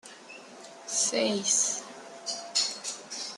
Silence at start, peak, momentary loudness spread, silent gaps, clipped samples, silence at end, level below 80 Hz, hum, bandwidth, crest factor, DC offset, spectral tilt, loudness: 0.05 s; -12 dBFS; 21 LU; none; under 0.1%; 0 s; -84 dBFS; none; 13 kHz; 20 dB; under 0.1%; -0.5 dB/octave; -28 LUFS